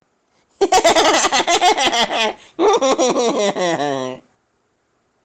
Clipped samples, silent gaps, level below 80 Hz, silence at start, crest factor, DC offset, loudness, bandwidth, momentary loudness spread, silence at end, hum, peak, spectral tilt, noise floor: under 0.1%; none; -50 dBFS; 0.6 s; 12 dB; under 0.1%; -16 LUFS; 17 kHz; 9 LU; 1.05 s; none; -6 dBFS; -2 dB/octave; -65 dBFS